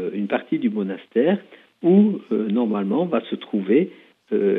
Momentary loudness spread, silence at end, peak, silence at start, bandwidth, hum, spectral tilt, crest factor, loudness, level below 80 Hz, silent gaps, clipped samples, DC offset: 10 LU; 0 s; -6 dBFS; 0 s; 3.9 kHz; none; -10 dB/octave; 16 dB; -22 LUFS; -80 dBFS; none; under 0.1%; under 0.1%